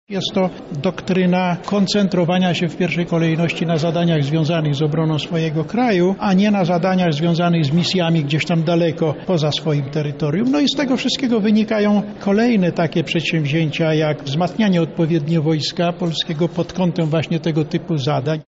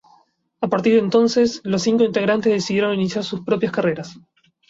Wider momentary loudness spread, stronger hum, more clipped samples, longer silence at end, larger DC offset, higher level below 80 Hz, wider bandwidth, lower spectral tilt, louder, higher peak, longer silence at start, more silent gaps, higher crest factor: second, 4 LU vs 8 LU; neither; neither; second, 0.05 s vs 0.5 s; neither; first, -52 dBFS vs -60 dBFS; about the same, 8 kHz vs 7.8 kHz; about the same, -5.5 dB/octave vs -5.5 dB/octave; about the same, -18 LUFS vs -19 LUFS; second, -8 dBFS vs -4 dBFS; second, 0.1 s vs 0.6 s; neither; second, 10 dB vs 16 dB